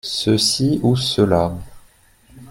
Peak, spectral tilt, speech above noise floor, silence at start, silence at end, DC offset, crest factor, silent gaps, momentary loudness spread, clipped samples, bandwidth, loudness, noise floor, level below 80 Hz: -2 dBFS; -5 dB/octave; 34 dB; 0.05 s; 0.05 s; under 0.1%; 16 dB; none; 6 LU; under 0.1%; 16.5 kHz; -17 LUFS; -51 dBFS; -46 dBFS